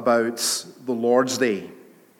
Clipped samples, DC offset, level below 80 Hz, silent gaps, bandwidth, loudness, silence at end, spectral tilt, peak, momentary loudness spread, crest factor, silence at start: under 0.1%; under 0.1%; -80 dBFS; none; 17.5 kHz; -22 LUFS; 0.4 s; -3 dB/octave; -6 dBFS; 10 LU; 18 dB; 0 s